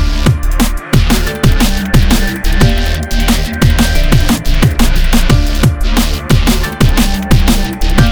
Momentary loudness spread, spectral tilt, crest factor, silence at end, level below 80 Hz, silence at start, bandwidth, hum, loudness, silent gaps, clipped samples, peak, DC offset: 3 LU; -5 dB/octave; 10 dB; 0 s; -12 dBFS; 0 s; over 20 kHz; none; -12 LUFS; none; 0.4%; 0 dBFS; under 0.1%